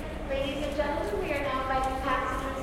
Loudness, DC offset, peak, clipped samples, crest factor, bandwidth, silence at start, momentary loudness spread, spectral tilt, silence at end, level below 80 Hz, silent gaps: -30 LUFS; under 0.1%; -14 dBFS; under 0.1%; 16 dB; 16.5 kHz; 0 s; 3 LU; -5.5 dB/octave; 0 s; -40 dBFS; none